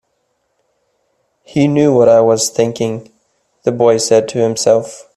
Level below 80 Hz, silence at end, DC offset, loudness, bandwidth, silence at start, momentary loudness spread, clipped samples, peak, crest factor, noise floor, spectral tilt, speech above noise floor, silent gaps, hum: -56 dBFS; 0.15 s; under 0.1%; -13 LUFS; 13.5 kHz; 1.55 s; 11 LU; under 0.1%; 0 dBFS; 14 dB; -65 dBFS; -5 dB/octave; 53 dB; none; none